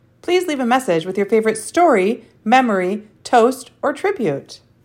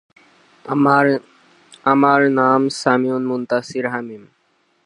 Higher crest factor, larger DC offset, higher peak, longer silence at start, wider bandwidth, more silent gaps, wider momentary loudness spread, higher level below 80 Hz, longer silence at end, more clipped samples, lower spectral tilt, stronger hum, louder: about the same, 16 dB vs 18 dB; neither; about the same, -2 dBFS vs 0 dBFS; second, 0.3 s vs 0.65 s; first, 16 kHz vs 11 kHz; neither; about the same, 9 LU vs 11 LU; first, -64 dBFS vs -72 dBFS; second, 0.3 s vs 0.65 s; neither; second, -4.5 dB/octave vs -6 dB/octave; neither; about the same, -17 LUFS vs -17 LUFS